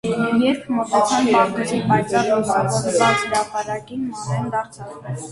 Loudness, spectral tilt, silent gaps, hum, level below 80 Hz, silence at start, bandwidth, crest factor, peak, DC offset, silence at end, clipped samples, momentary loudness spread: -19 LUFS; -5 dB/octave; none; none; -54 dBFS; 0.05 s; 11.5 kHz; 16 dB; -4 dBFS; under 0.1%; 0 s; under 0.1%; 11 LU